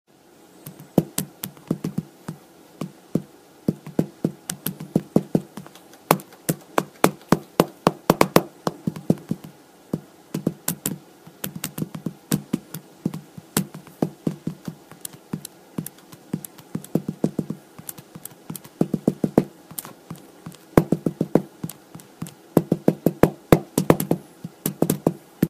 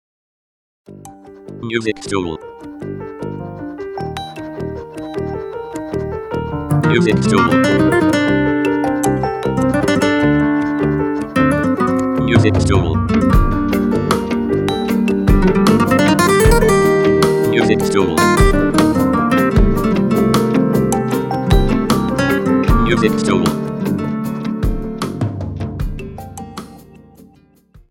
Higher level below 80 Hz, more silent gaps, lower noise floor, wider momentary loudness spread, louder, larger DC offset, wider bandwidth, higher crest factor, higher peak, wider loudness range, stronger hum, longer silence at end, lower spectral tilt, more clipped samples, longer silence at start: second, -52 dBFS vs -26 dBFS; neither; about the same, -52 dBFS vs -49 dBFS; first, 18 LU vs 14 LU; second, -25 LUFS vs -15 LUFS; neither; second, 15.5 kHz vs 18 kHz; first, 26 dB vs 16 dB; about the same, 0 dBFS vs 0 dBFS; second, 9 LU vs 12 LU; neither; second, 0 s vs 1.1 s; about the same, -6 dB/octave vs -6 dB/octave; neither; second, 0.65 s vs 0.9 s